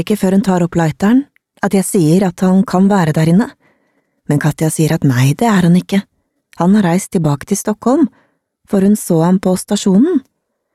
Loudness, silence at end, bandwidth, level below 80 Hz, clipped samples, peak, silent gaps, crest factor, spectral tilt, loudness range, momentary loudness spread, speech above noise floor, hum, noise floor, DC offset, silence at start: -13 LUFS; 0.55 s; 14.5 kHz; -48 dBFS; under 0.1%; -2 dBFS; none; 12 dB; -6.5 dB/octave; 2 LU; 6 LU; 49 dB; none; -61 dBFS; 0.1%; 0 s